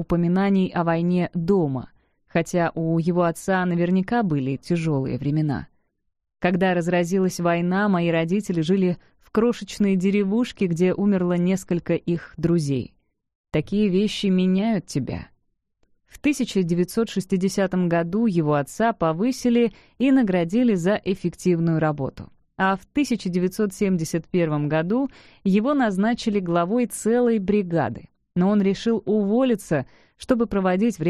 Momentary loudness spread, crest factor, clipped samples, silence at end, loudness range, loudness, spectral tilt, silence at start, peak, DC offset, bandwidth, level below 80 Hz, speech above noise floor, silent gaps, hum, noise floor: 6 LU; 18 dB; under 0.1%; 0 s; 2 LU; -22 LUFS; -7 dB/octave; 0 s; -4 dBFS; under 0.1%; 13.5 kHz; -52 dBFS; 46 dB; 13.35-13.44 s; none; -68 dBFS